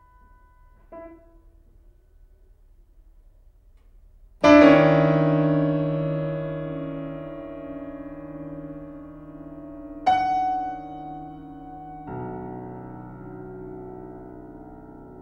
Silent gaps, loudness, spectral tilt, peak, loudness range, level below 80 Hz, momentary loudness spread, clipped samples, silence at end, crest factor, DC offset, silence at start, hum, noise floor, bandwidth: none; -21 LUFS; -8 dB/octave; -2 dBFS; 18 LU; -50 dBFS; 24 LU; under 0.1%; 0 s; 24 dB; under 0.1%; 0.9 s; none; -53 dBFS; 6.8 kHz